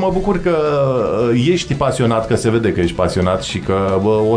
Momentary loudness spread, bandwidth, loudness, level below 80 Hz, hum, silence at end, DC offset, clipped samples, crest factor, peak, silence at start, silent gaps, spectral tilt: 3 LU; 11 kHz; -16 LUFS; -34 dBFS; none; 0 s; under 0.1%; under 0.1%; 14 dB; -2 dBFS; 0 s; none; -6.5 dB/octave